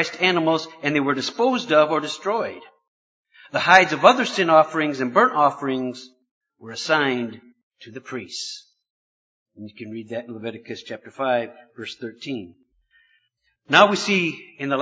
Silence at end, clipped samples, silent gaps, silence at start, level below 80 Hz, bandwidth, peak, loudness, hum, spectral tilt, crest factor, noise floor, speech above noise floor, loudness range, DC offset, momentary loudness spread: 0 s; under 0.1%; 2.88-3.24 s, 6.31-6.41 s, 7.63-7.71 s, 8.90-9.46 s; 0 s; -70 dBFS; 8 kHz; 0 dBFS; -20 LUFS; none; -4 dB/octave; 22 dB; -69 dBFS; 48 dB; 15 LU; under 0.1%; 20 LU